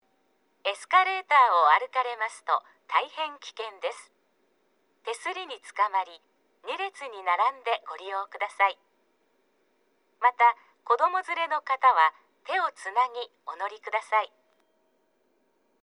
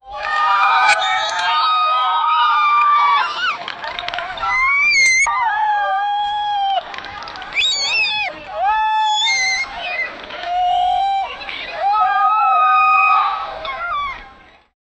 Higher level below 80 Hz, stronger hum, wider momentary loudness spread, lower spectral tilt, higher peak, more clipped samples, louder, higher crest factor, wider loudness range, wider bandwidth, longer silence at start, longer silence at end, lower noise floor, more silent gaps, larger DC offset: second, under -90 dBFS vs -50 dBFS; neither; first, 16 LU vs 13 LU; about the same, 1 dB/octave vs 1 dB/octave; second, -8 dBFS vs -2 dBFS; neither; second, -26 LUFS vs -16 LUFS; first, 22 dB vs 16 dB; first, 9 LU vs 4 LU; first, 11.5 kHz vs 9.4 kHz; first, 0.65 s vs 0.05 s; first, 1.55 s vs 0.65 s; first, -71 dBFS vs -44 dBFS; neither; neither